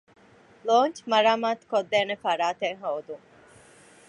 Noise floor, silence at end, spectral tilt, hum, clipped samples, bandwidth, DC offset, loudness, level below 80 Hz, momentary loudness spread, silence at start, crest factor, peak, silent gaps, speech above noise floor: -53 dBFS; 0.9 s; -3.5 dB/octave; none; under 0.1%; 11 kHz; under 0.1%; -25 LUFS; -76 dBFS; 13 LU; 0.65 s; 20 dB; -8 dBFS; none; 29 dB